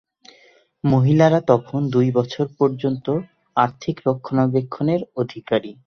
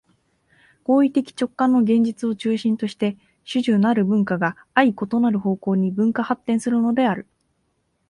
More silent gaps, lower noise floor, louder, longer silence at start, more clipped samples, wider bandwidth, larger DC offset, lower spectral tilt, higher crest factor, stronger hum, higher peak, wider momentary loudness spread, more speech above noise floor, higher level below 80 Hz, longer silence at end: neither; second, -54 dBFS vs -69 dBFS; about the same, -20 LUFS vs -21 LUFS; about the same, 0.85 s vs 0.9 s; neither; second, 6.6 kHz vs 11 kHz; neither; first, -8.5 dB/octave vs -7 dB/octave; about the same, 18 dB vs 18 dB; neither; about the same, -2 dBFS vs -2 dBFS; first, 10 LU vs 7 LU; second, 35 dB vs 50 dB; first, -56 dBFS vs -62 dBFS; second, 0.15 s vs 0.9 s